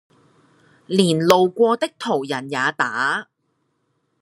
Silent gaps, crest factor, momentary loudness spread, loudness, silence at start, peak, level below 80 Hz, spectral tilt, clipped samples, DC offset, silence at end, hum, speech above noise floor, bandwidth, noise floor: none; 22 dB; 8 LU; -19 LUFS; 0.9 s; 0 dBFS; -66 dBFS; -5 dB/octave; under 0.1%; under 0.1%; 1 s; none; 51 dB; 13 kHz; -70 dBFS